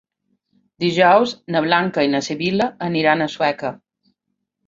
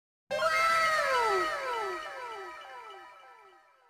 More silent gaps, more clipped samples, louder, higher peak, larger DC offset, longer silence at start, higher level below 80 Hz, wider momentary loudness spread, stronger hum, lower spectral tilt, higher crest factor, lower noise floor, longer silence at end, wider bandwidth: neither; neither; first, -18 LUFS vs -29 LUFS; first, -2 dBFS vs -16 dBFS; neither; first, 0.8 s vs 0.3 s; about the same, -62 dBFS vs -66 dBFS; second, 8 LU vs 21 LU; neither; first, -5.5 dB/octave vs -1.5 dB/octave; about the same, 18 dB vs 16 dB; first, -76 dBFS vs -59 dBFS; first, 0.95 s vs 0.4 s; second, 7.8 kHz vs 15.5 kHz